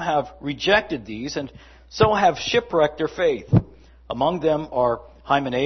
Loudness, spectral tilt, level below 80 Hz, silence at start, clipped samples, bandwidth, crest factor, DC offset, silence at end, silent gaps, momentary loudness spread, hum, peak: -22 LUFS; -5.5 dB/octave; -46 dBFS; 0 s; under 0.1%; 6.4 kHz; 18 dB; under 0.1%; 0 s; none; 12 LU; none; -4 dBFS